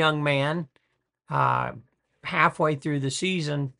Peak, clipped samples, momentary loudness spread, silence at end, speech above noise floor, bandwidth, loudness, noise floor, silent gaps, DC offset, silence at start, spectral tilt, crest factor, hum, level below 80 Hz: -4 dBFS; under 0.1%; 11 LU; 0.1 s; 41 dB; 11 kHz; -25 LUFS; -66 dBFS; none; under 0.1%; 0 s; -5 dB/octave; 22 dB; none; -64 dBFS